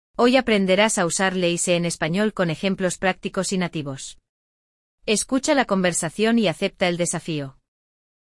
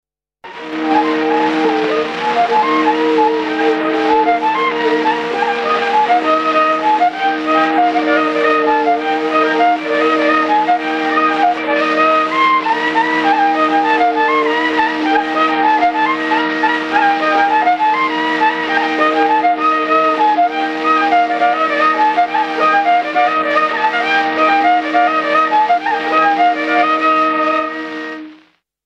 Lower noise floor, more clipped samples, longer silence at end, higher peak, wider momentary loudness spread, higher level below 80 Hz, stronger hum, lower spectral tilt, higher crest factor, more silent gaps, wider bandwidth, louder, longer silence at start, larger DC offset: first, under -90 dBFS vs -50 dBFS; neither; first, 0.9 s vs 0.5 s; second, -4 dBFS vs 0 dBFS; first, 11 LU vs 3 LU; first, -54 dBFS vs -60 dBFS; neither; about the same, -4 dB/octave vs -4 dB/octave; about the same, 18 dB vs 14 dB; first, 4.29-4.98 s vs none; first, 12 kHz vs 9.2 kHz; second, -21 LUFS vs -13 LUFS; second, 0.2 s vs 0.45 s; neither